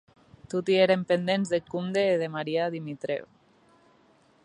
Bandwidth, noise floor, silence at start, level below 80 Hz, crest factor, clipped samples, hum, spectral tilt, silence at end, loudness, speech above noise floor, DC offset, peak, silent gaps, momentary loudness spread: 10.5 kHz; -62 dBFS; 0.5 s; -70 dBFS; 18 dB; under 0.1%; none; -6 dB/octave; 1.2 s; -27 LUFS; 35 dB; under 0.1%; -10 dBFS; none; 11 LU